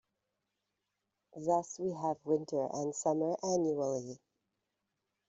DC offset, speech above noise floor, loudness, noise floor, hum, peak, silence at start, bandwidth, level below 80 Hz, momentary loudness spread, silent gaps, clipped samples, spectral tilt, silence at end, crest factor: under 0.1%; 52 dB; -35 LUFS; -86 dBFS; none; -18 dBFS; 1.35 s; 8 kHz; -80 dBFS; 8 LU; none; under 0.1%; -6 dB/octave; 1.15 s; 18 dB